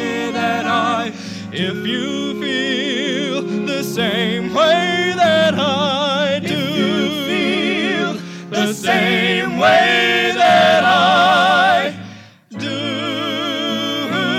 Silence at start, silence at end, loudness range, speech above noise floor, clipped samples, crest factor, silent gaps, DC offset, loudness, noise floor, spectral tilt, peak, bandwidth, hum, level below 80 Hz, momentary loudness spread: 0 s; 0 s; 7 LU; 21 dB; under 0.1%; 16 dB; none; under 0.1%; -16 LUFS; -37 dBFS; -4 dB/octave; 0 dBFS; 16 kHz; none; -60 dBFS; 10 LU